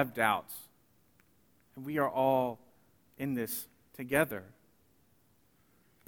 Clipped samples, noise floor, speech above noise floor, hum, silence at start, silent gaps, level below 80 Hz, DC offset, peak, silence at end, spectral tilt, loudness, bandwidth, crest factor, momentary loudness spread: under 0.1%; -69 dBFS; 37 dB; none; 0 s; none; -70 dBFS; under 0.1%; -10 dBFS; 1.55 s; -5 dB/octave; -33 LUFS; 20 kHz; 24 dB; 18 LU